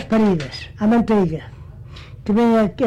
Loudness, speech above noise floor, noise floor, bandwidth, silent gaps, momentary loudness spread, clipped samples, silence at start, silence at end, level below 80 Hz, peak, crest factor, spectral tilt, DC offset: -18 LUFS; 20 dB; -37 dBFS; 8.8 kHz; none; 22 LU; under 0.1%; 0 s; 0 s; -42 dBFS; -12 dBFS; 8 dB; -8 dB/octave; under 0.1%